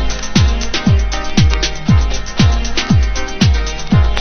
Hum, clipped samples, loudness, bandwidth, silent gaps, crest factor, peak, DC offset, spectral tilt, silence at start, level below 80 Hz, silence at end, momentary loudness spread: none; under 0.1%; -15 LUFS; 6.8 kHz; none; 12 dB; 0 dBFS; under 0.1%; -5 dB/octave; 0 s; -16 dBFS; 0 s; 3 LU